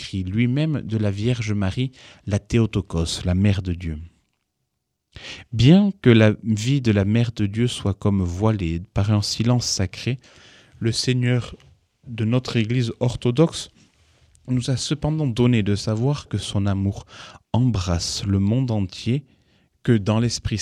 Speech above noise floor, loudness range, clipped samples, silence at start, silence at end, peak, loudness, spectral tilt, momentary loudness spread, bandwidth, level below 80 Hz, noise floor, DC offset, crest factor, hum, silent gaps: 56 dB; 5 LU; under 0.1%; 0 s; 0 s; -2 dBFS; -21 LUFS; -6 dB/octave; 10 LU; 11.5 kHz; -42 dBFS; -77 dBFS; under 0.1%; 20 dB; none; none